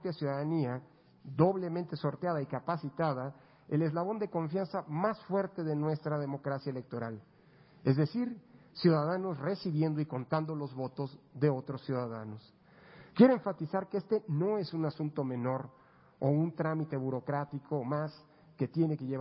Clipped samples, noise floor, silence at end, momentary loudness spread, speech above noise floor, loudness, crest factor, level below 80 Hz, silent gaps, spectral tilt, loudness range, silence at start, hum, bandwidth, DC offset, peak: under 0.1%; -61 dBFS; 0 s; 11 LU; 28 dB; -34 LUFS; 22 dB; -74 dBFS; none; -7.5 dB/octave; 4 LU; 0 s; none; 5.6 kHz; under 0.1%; -10 dBFS